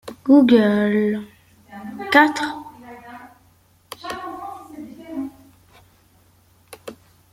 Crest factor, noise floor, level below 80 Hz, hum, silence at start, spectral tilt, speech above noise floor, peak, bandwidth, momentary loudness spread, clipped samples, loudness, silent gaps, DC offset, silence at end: 20 dB; -56 dBFS; -62 dBFS; none; 0.05 s; -5.5 dB/octave; 40 dB; -2 dBFS; 15.5 kHz; 25 LU; under 0.1%; -18 LUFS; none; under 0.1%; 0.4 s